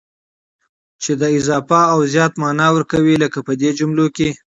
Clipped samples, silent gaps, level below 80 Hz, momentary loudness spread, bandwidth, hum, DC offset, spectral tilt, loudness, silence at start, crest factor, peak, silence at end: under 0.1%; none; -50 dBFS; 5 LU; 8 kHz; none; under 0.1%; -5.5 dB/octave; -15 LUFS; 1 s; 16 dB; 0 dBFS; 0.15 s